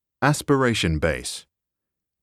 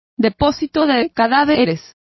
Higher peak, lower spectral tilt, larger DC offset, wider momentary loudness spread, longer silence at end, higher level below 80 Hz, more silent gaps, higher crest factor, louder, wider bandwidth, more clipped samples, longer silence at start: second, -6 dBFS vs -2 dBFS; about the same, -5 dB/octave vs -6 dB/octave; neither; first, 12 LU vs 6 LU; first, 0.8 s vs 0.35 s; about the same, -40 dBFS vs -40 dBFS; neither; about the same, 18 dB vs 16 dB; second, -22 LUFS vs -16 LUFS; first, 15 kHz vs 6 kHz; neither; about the same, 0.2 s vs 0.2 s